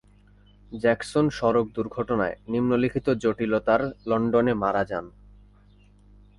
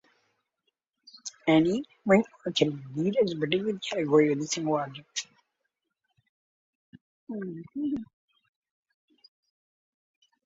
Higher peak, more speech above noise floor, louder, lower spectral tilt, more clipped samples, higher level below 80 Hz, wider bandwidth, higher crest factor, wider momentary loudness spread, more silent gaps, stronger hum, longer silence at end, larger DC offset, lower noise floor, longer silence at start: about the same, -8 dBFS vs -8 dBFS; second, 31 dB vs 55 dB; first, -25 LUFS vs -28 LUFS; first, -7 dB/octave vs -5 dB/octave; neither; first, -52 dBFS vs -70 dBFS; first, 11.5 kHz vs 8 kHz; about the same, 18 dB vs 22 dB; second, 6 LU vs 14 LU; second, none vs 6.29-6.93 s, 7.01-7.27 s; first, 50 Hz at -50 dBFS vs none; second, 1.3 s vs 2.4 s; neither; second, -55 dBFS vs -82 dBFS; second, 0.7 s vs 1.25 s